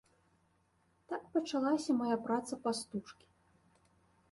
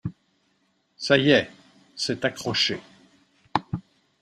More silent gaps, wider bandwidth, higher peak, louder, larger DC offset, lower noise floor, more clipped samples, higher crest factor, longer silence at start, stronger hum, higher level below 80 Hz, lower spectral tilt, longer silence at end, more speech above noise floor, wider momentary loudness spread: neither; second, 11.5 kHz vs 13 kHz; second, -20 dBFS vs -4 dBFS; second, -36 LUFS vs -24 LUFS; neither; first, -74 dBFS vs -69 dBFS; neither; second, 18 dB vs 24 dB; first, 1.1 s vs 0.05 s; neither; second, -78 dBFS vs -60 dBFS; about the same, -4.5 dB/octave vs -4.5 dB/octave; first, 1.2 s vs 0.4 s; second, 39 dB vs 46 dB; second, 12 LU vs 18 LU